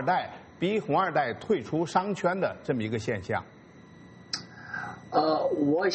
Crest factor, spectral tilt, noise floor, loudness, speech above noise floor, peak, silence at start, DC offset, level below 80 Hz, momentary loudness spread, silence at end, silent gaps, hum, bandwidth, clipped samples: 20 dB; -6 dB/octave; -51 dBFS; -29 LUFS; 23 dB; -10 dBFS; 0 s; under 0.1%; -68 dBFS; 11 LU; 0 s; none; none; 8.4 kHz; under 0.1%